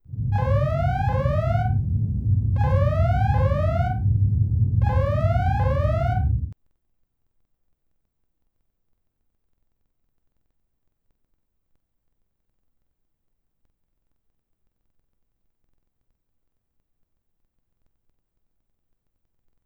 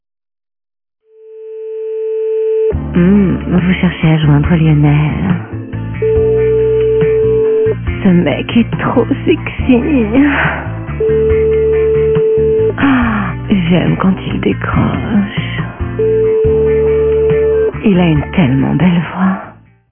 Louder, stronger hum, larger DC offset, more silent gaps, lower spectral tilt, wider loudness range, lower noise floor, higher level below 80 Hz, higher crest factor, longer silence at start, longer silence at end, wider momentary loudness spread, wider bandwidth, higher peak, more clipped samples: second, -22 LUFS vs -12 LUFS; neither; neither; neither; second, -9.5 dB/octave vs -12 dB/octave; first, 7 LU vs 2 LU; first, -73 dBFS vs -33 dBFS; second, -34 dBFS vs -28 dBFS; about the same, 16 dB vs 12 dB; second, 0.1 s vs 1.25 s; first, 13.1 s vs 0.4 s; second, 4 LU vs 7 LU; first, 5.2 kHz vs 3.5 kHz; second, -10 dBFS vs 0 dBFS; neither